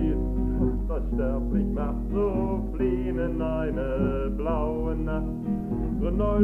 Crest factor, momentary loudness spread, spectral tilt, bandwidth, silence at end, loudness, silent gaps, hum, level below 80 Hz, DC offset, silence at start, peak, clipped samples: 16 dB; 3 LU; -10.5 dB/octave; 3.3 kHz; 0 s; -28 LUFS; none; none; -30 dBFS; under 0.1%; 0 s; -8 dBFS; under 0.1%